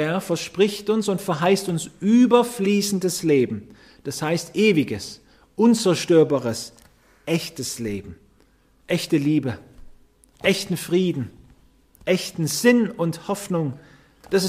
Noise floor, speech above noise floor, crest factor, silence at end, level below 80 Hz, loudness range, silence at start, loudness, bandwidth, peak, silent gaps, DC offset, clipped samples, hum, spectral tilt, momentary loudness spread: -58 dBFS; 37 dB; 18 dB; 0 s; -56 dBFS; 6 LU; 0 s; -22 LUFS; 15.5 kHz; -4 dBFS; none; under 0.1%; under 0.1%; none; -5 dB/octave; 14 LU